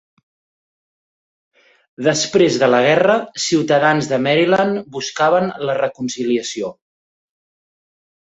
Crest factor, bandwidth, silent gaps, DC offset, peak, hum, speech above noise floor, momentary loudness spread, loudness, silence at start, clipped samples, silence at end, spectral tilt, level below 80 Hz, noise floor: 16 dB; 8.2 kHz; none; under 0.1%; -2 dBFS; none; over 74 dB; 10 LU; -16 LUFS; 2 s; under 0.1%; 1.65 s; -4 dB/octave; -60 dBFS; under -90 dBFS